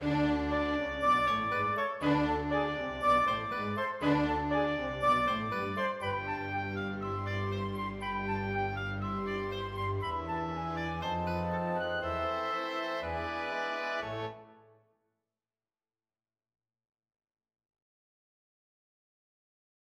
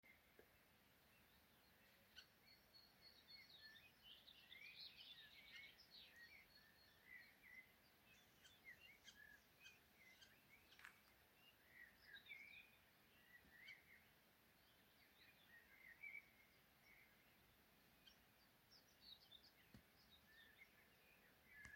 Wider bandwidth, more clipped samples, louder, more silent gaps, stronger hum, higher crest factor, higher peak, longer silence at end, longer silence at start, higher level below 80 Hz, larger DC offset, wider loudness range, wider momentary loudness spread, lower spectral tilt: second, 14.5 kHz vs 16.5 kHz; neither; first, -32 LUFS vs -64 LUFS; neither; neither; second, 18 dB vs 28 dB; first, -16 dBFS vs -40 dBFS; first, 5.4 s vs 0 s; about the same, 0 s vs 0.05 s; first, -52 dBFS vs -88 dBFS; neither; about the same, 8 LU vs 6 LU; about the same, 8 LU vs 9 LU; first, -6.5 dB/octave vs -2 dB/octave